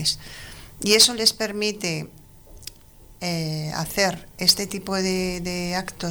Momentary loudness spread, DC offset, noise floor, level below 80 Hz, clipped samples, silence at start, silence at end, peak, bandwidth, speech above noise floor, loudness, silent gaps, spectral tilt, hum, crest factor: 25 LU; under 0.1%; -48 dBFS; -48 dBFS; under 0.1%; 0 s; 0 s; -6 dBFS; over 20 kHz; 25 dB; -22 LUFS; none; -2.5 dB/octave; none; 20 dB